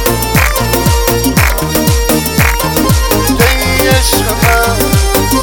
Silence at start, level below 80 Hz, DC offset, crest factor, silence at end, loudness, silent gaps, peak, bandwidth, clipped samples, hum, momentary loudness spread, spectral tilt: 0 s; -16 dBFS; under 0.1%; 10 dB; 0 s; -10 LUFS; none; 0 dBFS; over 20 kHz; under 0.1%; none; 2 LU; -4 dB/octave